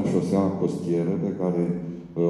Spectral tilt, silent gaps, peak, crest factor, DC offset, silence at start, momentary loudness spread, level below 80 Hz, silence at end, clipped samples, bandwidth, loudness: -9 dB/octave; none; -10 dBFS; 14 dB; under 0.1%; 0 s; 6 LU; -60 dBFS; 0 s; under 0.1%; 11 kHz; -25 LUFS